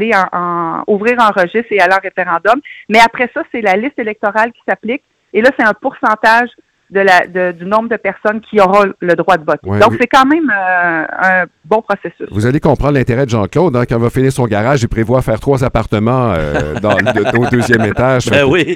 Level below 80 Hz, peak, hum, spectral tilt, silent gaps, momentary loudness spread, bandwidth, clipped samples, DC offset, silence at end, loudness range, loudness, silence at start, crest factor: -34 dBFS; 0 dBFS; none; -6 dB/octave; none; 7 LU; 17 kHz; 0.3%; under 0.1%; 0 s; 2 LU; -12 LUFS; 0 s; 12 dB